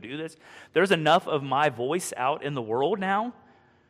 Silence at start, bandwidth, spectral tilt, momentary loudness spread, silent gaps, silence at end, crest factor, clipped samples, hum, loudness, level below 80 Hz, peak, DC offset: 0 s; 15 kHz; -4.5 dB/octave; 14 LU; none; 0.6 s; 18 dB; under 0.1%; none; -26 LUFS; -70 dBFS; -8 dBFS; under 0.1%